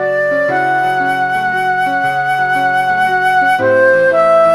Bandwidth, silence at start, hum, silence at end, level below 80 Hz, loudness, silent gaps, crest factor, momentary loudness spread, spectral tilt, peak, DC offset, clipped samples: 14 kHz; 0 s; none; 0 s; -60 dBFS; -12 LUFS; none; 12 dB; 5 LU; -5 dB/octave; 0 dBFS; under 0.1%; under 0.1%